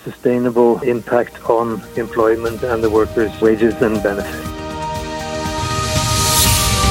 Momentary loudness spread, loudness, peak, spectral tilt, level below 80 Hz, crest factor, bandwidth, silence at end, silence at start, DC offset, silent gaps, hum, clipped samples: 11 LU; -17 LUFS; 0 dBFS; -4 dB/octave; -32 dBFS; 16 dB; 17 kHz; 0 s; 0.05 s; under 0.1%; none; none; under 0.1%